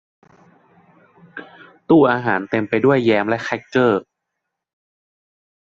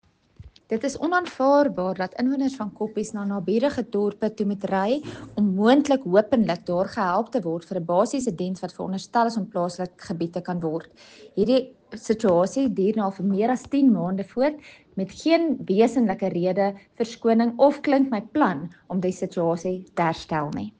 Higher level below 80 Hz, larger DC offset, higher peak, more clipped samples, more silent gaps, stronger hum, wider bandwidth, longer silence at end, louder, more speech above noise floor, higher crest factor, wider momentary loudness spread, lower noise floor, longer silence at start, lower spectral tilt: about the same, -60 dBFS vs -60 dBFS; neither; first, -2 dBFS vs -6 dBFS; neither; neither; neither; second, 7.4 kHz vs 9.4 kHz; first, 1.75 s vs 0.1 s; first, -17 LUFS vs -24 LUFS; first, 62 dB vs 26 dB; about the same, 18 dB vs 18 dB; first, 23 LU vs 11 LU; first, -79 dBFS vs -49 dBFS; first, 1.35 s vs 0.4 s; about the same, -7.5 dB/octave vs -6.5 dB/octave